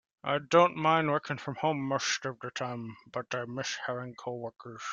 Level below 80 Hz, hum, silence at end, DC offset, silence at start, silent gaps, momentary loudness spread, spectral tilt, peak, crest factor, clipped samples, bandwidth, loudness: -74 dBFS; none; 0 s; under 0.1%; 0.25 s; none; 15 LU; -4.5 dB/octave; -10 dBFS; 22 dB; under 0.1%; 9 kHz; -31 LUFS